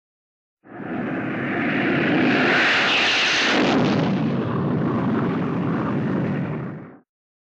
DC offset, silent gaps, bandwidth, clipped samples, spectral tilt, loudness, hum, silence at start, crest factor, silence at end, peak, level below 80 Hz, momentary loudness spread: under 0.1%; none; 8.8 kHz; under 0.1%; -5 dB/octave; -20 LUFS; none; 0.65 s; 16 dB; 0.6 s; -6 dBFS; -56 dBFS; 12 LU